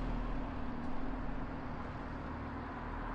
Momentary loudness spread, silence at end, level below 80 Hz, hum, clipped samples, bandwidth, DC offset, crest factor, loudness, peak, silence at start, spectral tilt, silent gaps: 2 LU; 0 s; -44 dBFS; none; under 0.1%; 6.4 kHz; under 0.1%; 12 dB; -43 LUFS; -26 dBFS; 0 s; -8 dB/octave; none